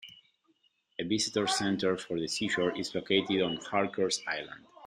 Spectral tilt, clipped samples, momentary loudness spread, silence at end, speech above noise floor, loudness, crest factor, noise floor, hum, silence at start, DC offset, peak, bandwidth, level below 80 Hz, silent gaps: -3.5 dB/octave; under 0.1%; 9 LU; 0 s; 41 dB; -31 LUFS; 20 dB; -72 dBFS; none; 0 s; under 0.1%; -12 dBFS; 14 kHz; -70 dBFS; none